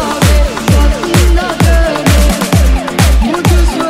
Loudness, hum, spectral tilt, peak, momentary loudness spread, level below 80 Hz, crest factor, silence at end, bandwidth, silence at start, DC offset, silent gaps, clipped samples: -10 LUFS; none; -5 dB/octave; 0 dBFS; 1 LU; -12 dBFS; 8 dB; 0 s; 16 kHz; 0 s; under 0.1%; none; under 0.1%